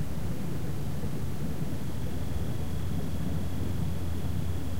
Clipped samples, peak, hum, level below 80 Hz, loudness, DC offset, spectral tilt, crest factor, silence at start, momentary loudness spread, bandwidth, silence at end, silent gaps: under 0.1%; -18 dBFS; none; -42 dBFS; -34 LUFS; 4%; -7 dB/octave; 14 dB; 0 s; 2 LU; 16 kHz; 0 s; none